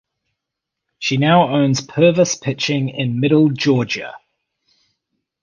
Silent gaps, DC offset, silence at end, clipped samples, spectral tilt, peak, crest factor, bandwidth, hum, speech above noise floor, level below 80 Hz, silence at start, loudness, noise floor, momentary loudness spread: none; under 0.1%; 1.25 s; under 0.1%; -5.5 dB/octave; 0 dBFS; 18 dB; 9.6 kHz; none; 65 dB; -54 dBFS; 1 s; -16 LUFS; -81 dBFS; 9 LU